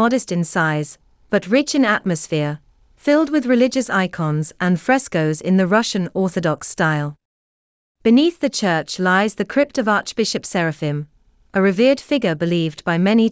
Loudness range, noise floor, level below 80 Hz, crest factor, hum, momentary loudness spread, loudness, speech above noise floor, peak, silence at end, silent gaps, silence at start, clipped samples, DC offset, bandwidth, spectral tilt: 2 LU; under -90 dBFS; -58 dBFS; 16 dB; none; 7 LU; -19 LUFS; over 72 dB; -4 dBFS; 0 s; 7.25-7.95 s; 0 s; under 0.1%; under 0.1%; 8 kHz; -5.5 dB/octave